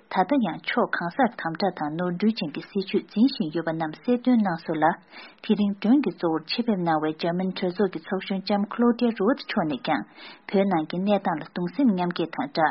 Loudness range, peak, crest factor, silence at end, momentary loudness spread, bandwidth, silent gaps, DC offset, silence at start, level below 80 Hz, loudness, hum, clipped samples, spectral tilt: 1 LU; -6 dBFS; 18 dB; 0 s; 7 LU; 5.8 kHz; none; under 0.1%; 0.1 s; -66 dBFS; -25 LUFS; none; under 0.1%; -5 dB/octave